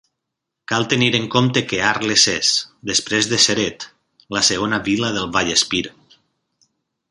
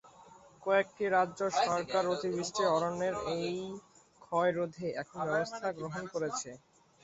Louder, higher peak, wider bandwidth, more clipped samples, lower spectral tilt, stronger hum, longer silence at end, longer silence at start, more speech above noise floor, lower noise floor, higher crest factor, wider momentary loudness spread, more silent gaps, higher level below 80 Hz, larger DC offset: first, -17 LUFS vs -33 LUFS; first, 0 dBFS vs -14 dBFS; first, 11.5 kHz vs 8.2 kHz; neither; second, -2.5 dB/octave vs -4.5 dB/octave; neither; first, 1.2 s vs 0.45 s; first, 0.7 s vs 0.05 s; first, 62 dB vs 25 dB; first, -80 dBFS vs -57 dBFS; about the same, 20 dB vs 18 dB; about the same, 9 LU vs 10 LU; neither; first, -52 dBFS vs -70 dBFS; neither